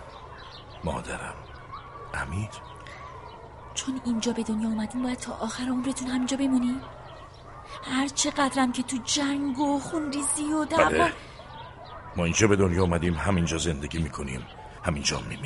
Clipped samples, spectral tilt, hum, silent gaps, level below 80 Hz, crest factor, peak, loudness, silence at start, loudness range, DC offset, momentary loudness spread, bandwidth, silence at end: under 0.1%; -4.5 dB/octave; none; none; -46 dBFS; 24 dB; -4 dBFS; -27 LUFS; 0 s; 9 LU; under 0.1%; 20 LU; 11.5 kHz; 0 s